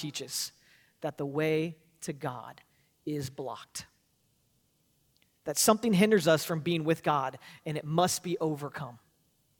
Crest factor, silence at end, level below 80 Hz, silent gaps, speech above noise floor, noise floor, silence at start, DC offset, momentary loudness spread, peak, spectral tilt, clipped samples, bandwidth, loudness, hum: 22 dB; 0.65 s; -72 dBFS; none; 42 dB; -72 dBFS; 0 s; under 0.1%; 18 LU; -8 dBFS; -4.5 dB/octave; under 0.1%; 19 kHz; -30 LUFS; none